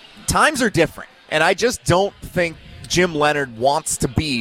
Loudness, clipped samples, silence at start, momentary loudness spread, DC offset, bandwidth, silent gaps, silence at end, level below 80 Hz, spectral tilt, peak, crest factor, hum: -19 LUFS; under 0.1%; 0.15 s; 6 LU; under 0.1%; 17 kHz; none; 0 s; -40 dBFS; -4 dB/octave; -4 dBFS; 16 dB; none